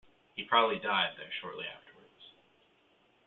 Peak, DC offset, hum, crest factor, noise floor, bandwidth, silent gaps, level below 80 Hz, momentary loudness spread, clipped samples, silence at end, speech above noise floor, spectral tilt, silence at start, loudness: -12 dBFS; under 0.1%; none; 24 dB; -68 dBFS; 4.4 kHz; none; -78 dBFS; 17 LU; under 0.1%; 0.95 s; 36 dB; 0.5 dB/octave; 0.35 s; -32 LUFS